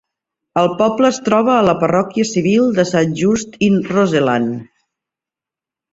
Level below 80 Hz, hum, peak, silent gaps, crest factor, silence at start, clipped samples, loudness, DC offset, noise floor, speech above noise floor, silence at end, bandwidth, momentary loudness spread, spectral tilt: -52 dBFS; none; -2 dBFS; none; 14 dB; 0.55 s; under 0.1%; -15 LUFS; under 0.1%; -88 dBFS; 73 dB; 1.3 s; 8 kHz; 4 LU; -6 dB/octave